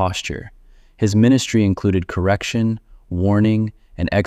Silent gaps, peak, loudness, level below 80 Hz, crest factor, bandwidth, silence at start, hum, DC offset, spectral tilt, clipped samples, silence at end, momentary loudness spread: none; -2 dBFS; -19 LUFS; -40 dBFS; 16 dB; 13 kHz; 0 s; none; under 0.1%; -6.5 dB/octave; under 0.1%; 0 s; 13 LU